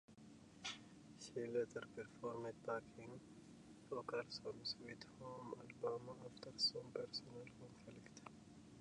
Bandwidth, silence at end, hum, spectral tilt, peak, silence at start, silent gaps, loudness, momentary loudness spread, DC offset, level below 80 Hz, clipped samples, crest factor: 11 kHz; 0 s; none; -4 dB/octave; -30 dBFS; 0.1 s; none; -48 LUFS; 18 LU; under 0.1%; -80 dBFS; under 0.1%; 22 dB